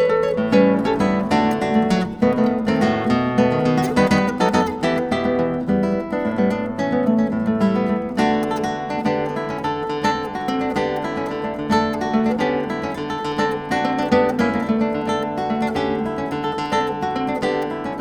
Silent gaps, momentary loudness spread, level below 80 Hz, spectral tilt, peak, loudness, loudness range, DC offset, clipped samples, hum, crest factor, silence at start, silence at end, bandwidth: none; 6 LU; -48 dBFS; -6.5 dB/octave; -4 dBFS; -20 LUFS; 4 LU; under 0.1%; under 0.1%; none; 16 dB; 0 s; 0 s; 13.5 kHz